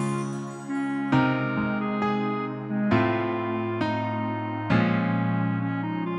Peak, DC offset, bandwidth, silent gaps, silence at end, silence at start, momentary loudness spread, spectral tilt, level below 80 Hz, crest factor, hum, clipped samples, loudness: -8 dBFS; under 0.1%; 11 kHz; none; 0 s; 0 s; 7 LU; -7.5 dB/octave; -58 dBFS; 18 dB; none; under 0.1%; -26 LUFS